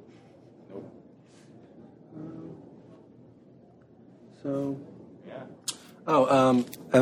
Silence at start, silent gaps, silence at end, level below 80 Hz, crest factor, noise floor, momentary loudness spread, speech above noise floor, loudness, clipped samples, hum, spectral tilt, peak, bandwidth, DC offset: 0.7 s; none; 0 s; -70 dBFS; 24 dB; -55 dBFS; 27 LU; 32 dB; -27 LUFS; under 0.1%; none; -5.5 dB/octave; -6 dBFS; 15.5 kHz; under 0.1%